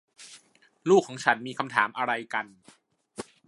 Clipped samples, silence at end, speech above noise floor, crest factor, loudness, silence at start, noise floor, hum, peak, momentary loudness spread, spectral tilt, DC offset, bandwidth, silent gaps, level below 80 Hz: under 0.1%; 0.25 s; 33 dB; 24 dB; -26 LUFS; 0.2 s; -59 dBFS; none; -4 dBFS; 24 LU; -4.5 dB/octave; under 0.1%; 11.5 kHz; none; -76 dBFS